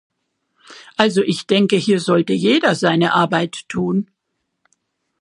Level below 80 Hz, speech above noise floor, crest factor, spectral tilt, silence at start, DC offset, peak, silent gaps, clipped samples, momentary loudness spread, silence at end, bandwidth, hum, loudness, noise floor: -62 dBFS; 58 dB; 18 dB; -5.5 dB/octave; 0.7 s; under 0.1%; 0 dBFS; none; under 0.1%; 8 LU; 1.15 s; 11 kHz; none; -17 LUFS; -74 dBFS